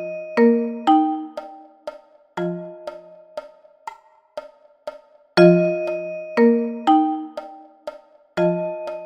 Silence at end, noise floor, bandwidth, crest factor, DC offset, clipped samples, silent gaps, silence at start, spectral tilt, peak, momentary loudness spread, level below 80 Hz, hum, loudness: 0 s; -40 dBFS; 8.8 kHz; 20 dB; under 0.1%; under 0.1%; none; 0 s; -8 dB/octave; 0 dBFS; 21 LU; -66 dBFS; none; -19 LUFS